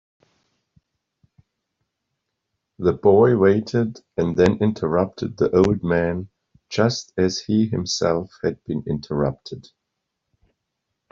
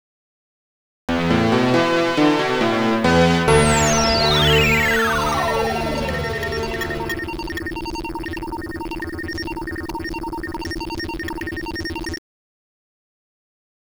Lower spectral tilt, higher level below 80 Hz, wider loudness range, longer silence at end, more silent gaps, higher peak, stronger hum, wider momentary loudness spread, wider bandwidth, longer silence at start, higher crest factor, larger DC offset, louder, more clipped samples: first, -6 dB/octave vs -4.5 dB/octave; second, -52 dBFS vs -36 dBFS; second, 6 LU vs 12 LU; second, 1.5 s vs 1.7 s; neither; about the same, -4 dBFS vs -2 dBFS; neither; about the same, 11 LU vs 13 LU; second, 7.6 kHz vs over 20 kHz; first, 2.8 s vs 1.1 s; about the same, 20 dB vs 18 dB; neither; about the same, -21 LUFS vs -20 LUFS; neither